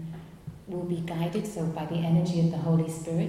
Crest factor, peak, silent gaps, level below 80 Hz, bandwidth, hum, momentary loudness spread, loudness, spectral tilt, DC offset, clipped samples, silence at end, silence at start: 14 dB; -14 dBFS; none; -56 dBFS; 13 kHz; none; 16 LU; -29 LUFS; -7.5 dB/octave; under 0.1%; under 0.1%; 0 s; 0 s